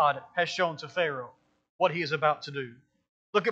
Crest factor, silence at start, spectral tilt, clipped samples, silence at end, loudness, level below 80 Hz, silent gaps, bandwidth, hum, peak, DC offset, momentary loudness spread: 20 dB; 0 s; -4.5 dB/octave; under 0.1%; 0 s; -29 LUFS; -82 dBFS; 1.70-1.79 s, 3.09-3.33 s; 8 kHz; none; -10 dBFS; under 0.1%; 12 LU